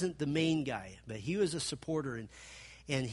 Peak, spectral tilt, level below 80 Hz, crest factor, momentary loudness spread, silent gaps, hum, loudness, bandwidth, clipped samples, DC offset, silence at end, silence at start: -18 dBFS; -5 dB/octave; -62 dBFS; 18 dB; 18 LU; none; none; -36 LUFS; 11.5 kHz; under 0.1%; under 0.1%; 0 s; 0 s